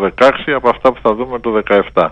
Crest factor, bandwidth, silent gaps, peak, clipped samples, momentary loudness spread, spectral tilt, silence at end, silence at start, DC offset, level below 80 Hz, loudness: 14 dB; 9.2 kHz; none; 0 dBFS; under 0.1%; 6 LU; -6 dB/octave; 0 s; 0 s; under 0.1%; -40 dBFS; -13 LUFS